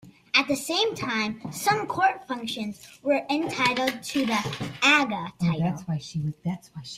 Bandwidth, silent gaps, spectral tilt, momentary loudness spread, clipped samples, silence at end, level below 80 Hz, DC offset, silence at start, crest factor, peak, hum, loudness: 15.5 kHz; none; -4 dB/octave; 11 LU; under 0.1%; 0 s; -62 dBFS; under 0.1%; 0.05 s; 22 dB; -6 dBFS; none; -25 LUFS